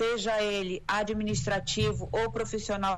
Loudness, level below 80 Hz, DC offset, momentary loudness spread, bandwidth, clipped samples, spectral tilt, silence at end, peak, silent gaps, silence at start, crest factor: -30 LUFS; -46 dBFS; under 0.1%; 4 LU; 12.5 kHz; under 0.1%; -4.5 dB/octave; 0 s; -16 dBFS; none; 0 s; 12 dB